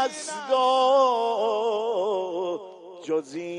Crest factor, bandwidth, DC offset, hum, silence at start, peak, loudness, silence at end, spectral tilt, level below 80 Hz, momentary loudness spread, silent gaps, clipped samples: 14 dB; 11 kHz; under 0.1%; none; 0 s; -10 dBFS; -24 LUFS; 0 s; -3 dB/octave; -80 dBFS; 13 LU; none; under 0.1%